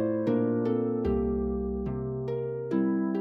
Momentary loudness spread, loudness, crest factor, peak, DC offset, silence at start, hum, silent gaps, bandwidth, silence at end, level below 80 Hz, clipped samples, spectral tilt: 6 LU; -29 LUFS; 12 dB; -16 dBFS; under 0.1%; 0 s; none; none; 5.6 kHz; 0 s; -42 dBFS; under 0.1%; -11 dB/octave